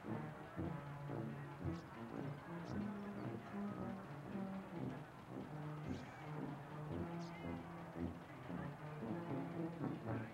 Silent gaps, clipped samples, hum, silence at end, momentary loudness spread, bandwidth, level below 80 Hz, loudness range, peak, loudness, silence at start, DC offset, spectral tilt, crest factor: none; under 0.1%; none; 0 s; 5 LU; 16 kHz; -72 dBFS; 1 LU; -28 dBFS; -48 LUFS; 0 s; under 0.1%; -8 dB/octave; 18 dB